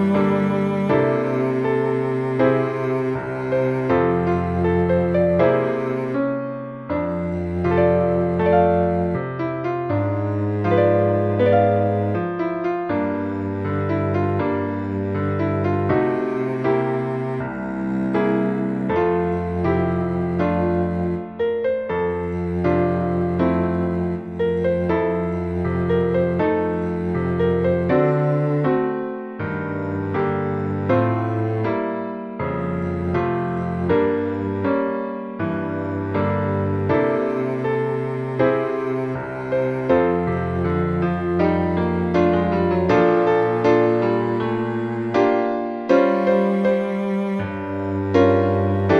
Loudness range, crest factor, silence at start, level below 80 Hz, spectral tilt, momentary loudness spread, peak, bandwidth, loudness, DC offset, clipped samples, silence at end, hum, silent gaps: 4 LU; 16 dB; 0 s; -46 dBFS; -9.5 dB/octave; 7 LU; -4 dBFS; 6.4 kHz; -21 LUFS; under 0.1%; under 0.1%; 0 s; none; none